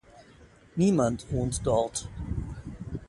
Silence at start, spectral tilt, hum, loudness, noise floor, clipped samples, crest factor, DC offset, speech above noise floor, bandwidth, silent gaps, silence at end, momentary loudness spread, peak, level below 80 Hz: 0.15 s; -6.5 dB/octave; none; -29 LUFS; -55 dBFS; under 0.1%; 18 dB; under 0.1%; 28 dB; 11.5 kHz; none; 0 s; 15 LU; -12 dBFS; -44 dBFS